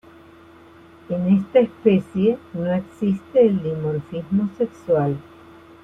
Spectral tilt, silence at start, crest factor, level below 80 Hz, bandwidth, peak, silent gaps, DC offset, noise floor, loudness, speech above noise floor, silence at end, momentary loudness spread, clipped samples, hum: -9.5 dB/octave; 1.1 s; 18 dB; -58 dBFS; 3.8 kHz; -2 dBFS; none; under 0.1%; -47 dBFS; -21 LUFS; 27 dB; 0.65 s; 9 LU; under 0.1%; none